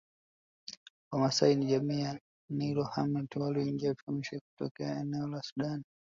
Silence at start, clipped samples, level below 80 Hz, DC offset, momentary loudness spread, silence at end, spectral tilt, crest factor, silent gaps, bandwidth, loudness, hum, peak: 0.7 s; under 0.1%; -70 dBFS; under 0.1%; 18 LU; 0.3 s; -6 dB/octave; 22 dB; 0.77-1.11 s, 2.21-2.48 s, 4.03-4.07 s, 4.41-4.57 s, 4.71-4.75 s, 5.52-5.56 s; 7.6 kHz; -34 LUFS; none; -12 dBFS